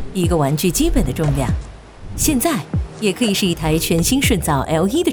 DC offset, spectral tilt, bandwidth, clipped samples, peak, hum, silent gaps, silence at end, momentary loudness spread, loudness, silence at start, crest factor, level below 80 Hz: under 0.1%; -4.5 dB/octave; over 20 kHz; under 0.1%; -4 dBFS; none; none; 0 s; 6 LU; -18 LUFS; 0 s; 14 dB; -28 dBFS